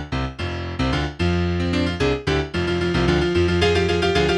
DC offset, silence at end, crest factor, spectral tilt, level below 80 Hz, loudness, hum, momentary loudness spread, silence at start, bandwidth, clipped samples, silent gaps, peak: under 0.1%; 0 s; 16 dB; -6 dB/octave; -32 dBFS; -21 LUFS; none; 8 LU; 0 s; 11 kHz; under 0.1%; none; -4 dBFS